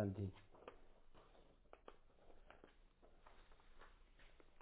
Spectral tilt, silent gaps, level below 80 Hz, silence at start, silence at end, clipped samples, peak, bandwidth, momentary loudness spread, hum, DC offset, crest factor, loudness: -8 dB/octave; none; -68 dBFS; 0 s; 0 s; under 0.1%; -30 dBFS; 4 kHz; 19 LU; none; under 0.1%; 26 dB; -54 LUFS